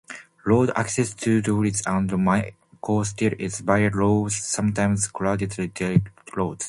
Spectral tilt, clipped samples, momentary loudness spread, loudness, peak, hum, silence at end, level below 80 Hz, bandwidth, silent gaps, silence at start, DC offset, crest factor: -5.5 dB/octave; under 0.1%; 8 LU; -23 LUFS; -4 dBFS; none; 0 s; -48 dBFS; 11.5 kHz; none; 0.1 s; under 0.1%; 18 dB